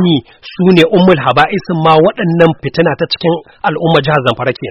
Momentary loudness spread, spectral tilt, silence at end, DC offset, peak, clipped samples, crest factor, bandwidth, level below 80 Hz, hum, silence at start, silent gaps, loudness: 8 LU; -7.5 dB/octave; 0 s; under 0.1%; 0 dBFS; 0.3%; 10 dB; 8.2 kHz; -44 dBFS; none; 0 s; none; -11 LUFS